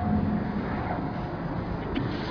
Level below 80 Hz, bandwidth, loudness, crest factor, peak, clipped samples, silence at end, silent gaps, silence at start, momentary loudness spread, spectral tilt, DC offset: -40 dBFS; 5.4 kHz; -30 LUFS; 14 dB; -16 dBFS; under 0.1%; 0 s; none; 0 s; 5 LU; -9 dB/octave; under 0.1%